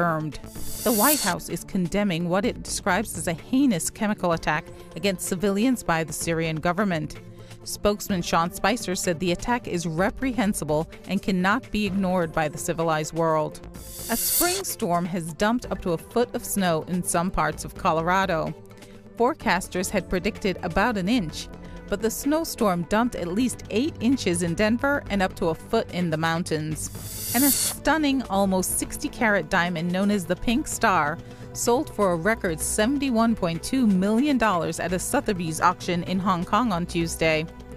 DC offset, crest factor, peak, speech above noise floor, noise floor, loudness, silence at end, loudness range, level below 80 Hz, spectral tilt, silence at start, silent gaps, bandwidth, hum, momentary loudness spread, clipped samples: under 0.1%; 18 dB; -6 dBFS; 20 dB; -45 dBFS; -24 LUFS; 0 s; 3 LU; -44 dBFS; -4.5 dB/octave; 0 s; none; 15.5 kHz; none; 7 LU; under 0.1%